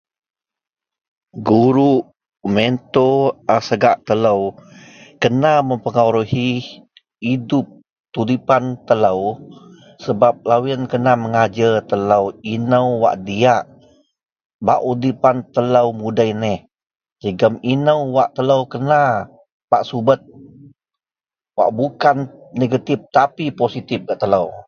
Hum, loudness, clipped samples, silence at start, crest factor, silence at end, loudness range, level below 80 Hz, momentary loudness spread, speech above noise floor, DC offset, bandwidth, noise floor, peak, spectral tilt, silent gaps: none; -17 LUFS; under 0.1%; 1.35 s; 18 dB; 0.05 s; 3 LU; -54 dBFS; 9 LU; over 74 dB; under 0.1%; 7 kHz; under -90 dBFS; 0 dBFS; -7 dB/octave; 8.00-8.04 s, 14.32-14.36 s, 14.45-14.59 s, 17.12-17.16 s, 19.52-19.68 s